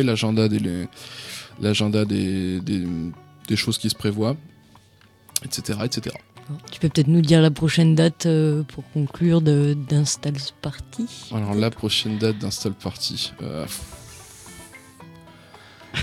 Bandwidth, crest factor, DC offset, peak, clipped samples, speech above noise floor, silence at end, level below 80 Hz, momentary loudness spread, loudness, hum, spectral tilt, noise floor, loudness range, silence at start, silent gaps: 15 kHz; 22 dB; under 0.1%; 0 dBFS; under 0.1%; 32 dB; 0 s; -52 dBFS; 18 LU; -22 LUFS; none; -5.5 dB/octave; -54 dBFS; 8 LU; 0 s; none